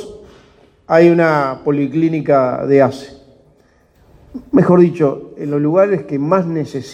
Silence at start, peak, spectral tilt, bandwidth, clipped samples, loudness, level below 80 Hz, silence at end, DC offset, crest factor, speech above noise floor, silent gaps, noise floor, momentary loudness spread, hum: 0 s; 0 dBFS; -8.5 dB/octave; 9 kHz; under 0.1%; -14 LUFS; -52 dBFS; 0 s; under 0.1%; 16 dB; 39 dB; none; -52 dBFS; 11 LU; none